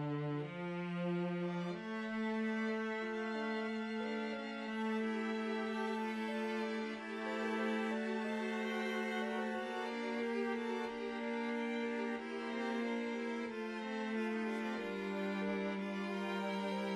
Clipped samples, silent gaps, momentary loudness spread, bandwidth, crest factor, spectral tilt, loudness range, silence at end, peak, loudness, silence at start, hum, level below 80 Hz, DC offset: under 0.1%; none; 4 LU; 11.5 kHz; 14 dB; -6 dB/octave; 1 LU; 0 s; -26 dBFS; -39 LUFS; 0 s; none; -80 dBFS; under 0.1%